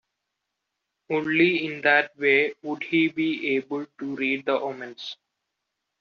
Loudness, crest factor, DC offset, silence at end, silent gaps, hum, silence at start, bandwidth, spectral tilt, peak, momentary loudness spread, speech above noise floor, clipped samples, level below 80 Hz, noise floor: -24 LUFS; 20 dB; under 0.1%; 0.85 s; none; none; 1.1 s; 6.8 kHz; -2.5 dB/octave; -6 dBFS; 14 LU; 57 dB; under 0.1%; -74 dBFS; -82 dBFS